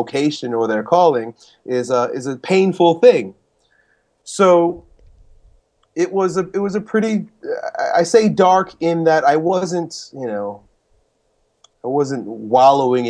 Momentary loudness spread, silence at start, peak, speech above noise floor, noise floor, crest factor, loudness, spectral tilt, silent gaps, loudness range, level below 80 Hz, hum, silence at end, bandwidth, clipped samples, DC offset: 15 LU; 0 s; 0 dBFS; 48 dB; -64 dBFS; 18 dB; -17 LUFS; -5.5 dB/octave; none; 5 LU; -58 dBFS; none; 0 s; 10.5 kHz; under 0.1%; under 0.1%